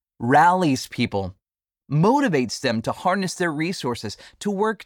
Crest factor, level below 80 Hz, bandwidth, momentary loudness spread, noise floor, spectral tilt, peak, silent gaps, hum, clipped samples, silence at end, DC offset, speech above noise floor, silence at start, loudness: 16 dB; -58 dBFS; 18 kHz; 12 LU; -89 dBFS; -5.5 dB/octave; -6 dBFS; none; none; under 0.1%; 0 s; under 0.1%; 68 dB; 0.2 s; -22 LUFS